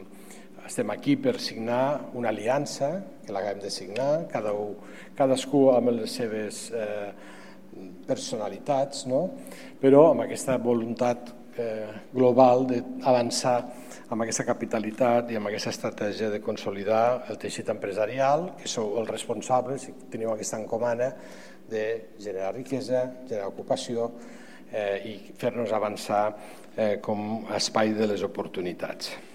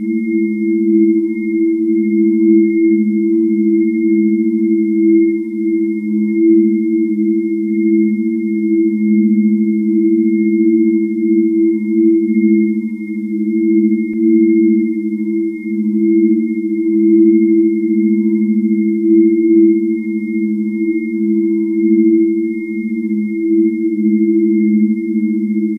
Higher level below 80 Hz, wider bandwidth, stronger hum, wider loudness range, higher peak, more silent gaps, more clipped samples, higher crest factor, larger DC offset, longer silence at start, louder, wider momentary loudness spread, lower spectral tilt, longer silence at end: about the same, -72 dBFS vs -76 dBFS; first, 16 kHz vs 2.3 kHz; neither; first, 7 LU vs 2 LU; second, -4 dBFS vs 0 dBFS; neither; neither; first, 24 dB vs 12 dB; first, 0.4% vs under 0.1%; about the same, 0 s vs 0 s; second, -27 LUFS vs -14 LUFS; first, 14 LU vs 7 LU; second, -5 dB/octave vs -11.5 dB/octave; about the same, 0 s vs 0 s